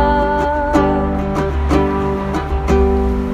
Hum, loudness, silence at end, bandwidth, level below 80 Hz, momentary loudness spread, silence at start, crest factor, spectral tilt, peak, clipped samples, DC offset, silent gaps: none; -16 LUFS; 0 s; 9.6 kHz; -20 dBFS; 4 LU; 0 s; 14 dB; -7.5 dB/octave; 0 dBFS; under 0.1%; under 0.1%; none